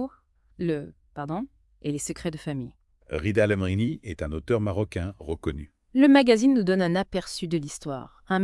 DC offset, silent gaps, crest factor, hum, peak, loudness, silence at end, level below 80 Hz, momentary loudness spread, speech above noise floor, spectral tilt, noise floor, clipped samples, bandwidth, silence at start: under 0.1%; none; 20 dB; none; -6 dBFS; -26 LUFS; 0 s; -48 dBFS; 17 LU; 32 dB; -6 dB/octave; -56 dBFS; under 0.1%; 12 kHz; 0 s